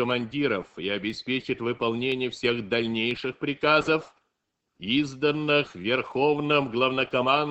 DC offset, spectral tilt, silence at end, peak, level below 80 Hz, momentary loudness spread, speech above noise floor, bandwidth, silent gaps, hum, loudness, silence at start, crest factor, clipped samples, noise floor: under 0.1%; -5.5 dB/octave; 0 s; -8 dBFS; -62 dBFS; 7 LU; 54 dB; 8.4 kHz; none; none; -26 LUFS; 0 s; 18 dB; under 0.1%; -79 dBFS